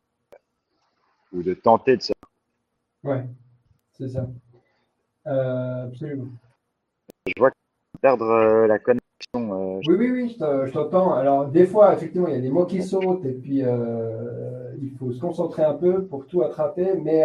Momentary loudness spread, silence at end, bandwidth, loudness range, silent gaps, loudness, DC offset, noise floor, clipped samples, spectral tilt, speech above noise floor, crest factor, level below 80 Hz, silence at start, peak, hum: 15 LU; 0 s; 10 kHz; 11 LU; none; -22 LUFS; under 0.1%; -77 dBFS; under 0.1%; -8 dB/octave; 56 dB; 20 dB; -62 dBFS; 1.35 s; -2 dBFS; none